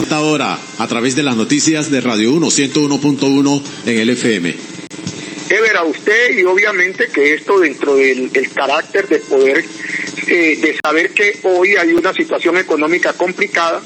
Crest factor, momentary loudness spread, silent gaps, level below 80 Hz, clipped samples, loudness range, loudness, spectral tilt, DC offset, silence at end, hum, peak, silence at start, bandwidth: 14 dB; 8 LU; none; -64 dBFS; under 0.1%; 2 LU; -13 LUFS; -3.5 dB/octave; under 0.1%; 0 s; none; 0 dBFS; 0 s; 13 kHz